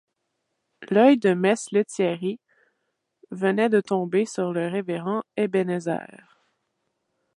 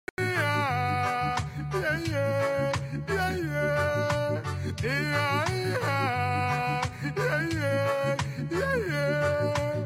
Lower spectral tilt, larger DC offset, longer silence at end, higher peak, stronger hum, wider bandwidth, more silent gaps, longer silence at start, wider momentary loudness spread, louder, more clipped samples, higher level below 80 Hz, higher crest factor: about the same, -6 dB/octave vs -5.5 dB/octave; neither; first, 1.35 s vs 0 s; first, -6 dBFS vs -14 dBFS; neither; second, 11.5 kHz vs 16 kHz; neither; first, 0.8 s vs 0.2 s; first, 12 LU vs 4 LU; first, -23 LUFS vs -28 LUFS; neither; second, -76 dBFS vs -50 dBFS; first, 20 dB vs 14 dB